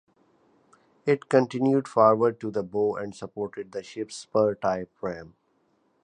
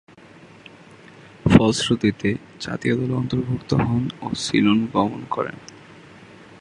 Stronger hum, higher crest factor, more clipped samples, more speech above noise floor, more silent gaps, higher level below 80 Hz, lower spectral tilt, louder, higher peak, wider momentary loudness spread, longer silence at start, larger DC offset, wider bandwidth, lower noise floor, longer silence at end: neither; about the same, 20 dB vs 22 dB; neither; first, 43 dB vs 25 dB; neither; second, -66 dBFS vs -44 dBFS; about the same, -6.5 dB/octave vs -6 dB/octave; second, -26 LUFS vs -21 LUFS; second, -6 dBFS vs 0 dBFS; about the same, 15 LU vs 13 LU; second, 1.05 s vs 1.45 s; neither; about the same, 10 kHz vs 11 kHz; first, -69 dBFS vs -46 dBFS; about the same, 0.75 s vs 0.85 s